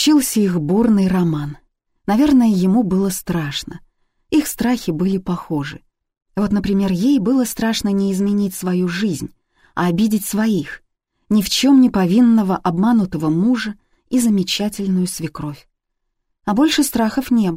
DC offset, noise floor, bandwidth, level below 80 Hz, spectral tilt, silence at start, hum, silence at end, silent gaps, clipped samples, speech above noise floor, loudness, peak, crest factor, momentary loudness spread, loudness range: under 0.1%; -73 dBFS; 16 kHz; -44 dBFS; -5.5 dB/octave; 0 s; none; 0 s; 6.22-6.26 s; under 0.1%; 57 dB; -17 LUFS; -4 dBFS; 14 dB; 13 LU; 5 LU